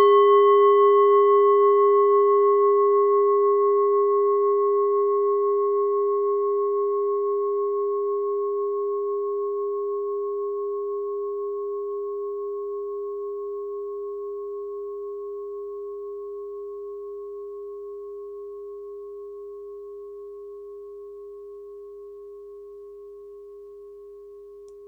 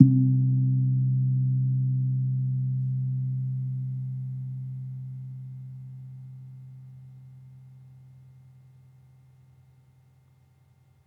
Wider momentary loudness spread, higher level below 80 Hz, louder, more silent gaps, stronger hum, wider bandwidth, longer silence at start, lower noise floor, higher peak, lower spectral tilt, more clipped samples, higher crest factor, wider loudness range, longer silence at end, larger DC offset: about the same, 24 LU vs 23 LU; first, -68 dBFS vs -74 dBFS; first, -22 LUFS vs -27 LUFS; neither; neither; first, 3.3 kHz vs 0.8 kHz; about the same, 0 s vs 0 s; second, -44 dBFS vs -60 dBFS; second, -8 dBFS vs -2 dBFS; second, -6 dB/octave vs -13.5 dB/octave; neither; second, 14 dB vs 26 dB; about the same, 22 LU vs 23 LU; second, 0 s vs 3.15 s; neither